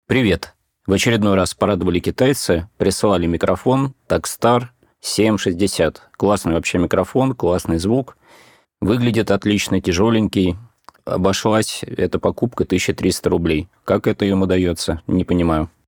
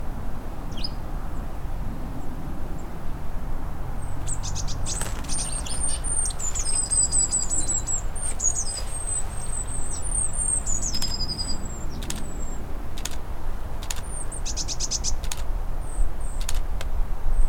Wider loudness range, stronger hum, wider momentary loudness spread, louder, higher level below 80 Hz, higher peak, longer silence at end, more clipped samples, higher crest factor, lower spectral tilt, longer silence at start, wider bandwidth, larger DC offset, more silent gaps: second, 2 LU vs 11 LU; neither; second, 6 LU vs 13 LU; first, -18 LUFS vs -28 LUFS; second, -40 dBFS vs -28 dBFS; first, -2 dBFS vs -8 dBFS; first, 0.2 s vs 0 s; neither; about the same, 16 dB vs 16 dB; first, -5.5 dB/octave vs -2.5 dB/octave; about the same, 0.1 s vs 0 s; first, 20 kHz vs 15 kHz; neither; neither